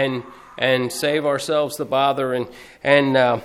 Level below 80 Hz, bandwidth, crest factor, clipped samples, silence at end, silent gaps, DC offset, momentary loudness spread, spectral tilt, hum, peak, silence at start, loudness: -60 dBFS; 16 kHz; 18 dB; under 0.1%; 0 s; none; under 0.1%; 11 LU; -4.5 dB/octave; none; -2 dBFS; 0 s; -20 LUFS